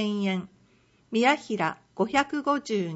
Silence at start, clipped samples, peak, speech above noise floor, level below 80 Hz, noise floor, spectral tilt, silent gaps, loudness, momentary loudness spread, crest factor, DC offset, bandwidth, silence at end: 0 s; under 0.1%; -8 dBFS; 36 dB; -66 dBFS; -62 dBFS; -5 dB/octave; none; -27 LUFS; 7 LU; 20 dB; under 0.1%; 8 kHz; 0 s